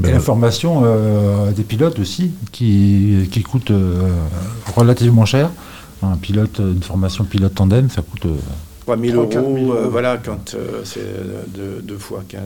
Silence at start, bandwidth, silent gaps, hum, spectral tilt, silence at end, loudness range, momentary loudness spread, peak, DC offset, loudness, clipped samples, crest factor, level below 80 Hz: 0 s; 18 kHz; none; none; -7 dB/octave; 0 s; 4 LU; 15 LU; 0 dBFS; 0.3%; -16 LUFS; under 0.1%; 16 dB; -38 dBFS